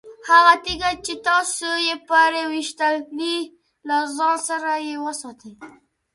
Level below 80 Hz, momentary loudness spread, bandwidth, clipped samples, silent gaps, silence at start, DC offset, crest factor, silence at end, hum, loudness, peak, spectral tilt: -54 dBFS; 13 LU; 11.5 kHz; under 0.1%; none; 0.05 s; under 0.1%; 20 dB; 0.45 s; none; -20 LUFS; 0 dBFS; -1 dB/octave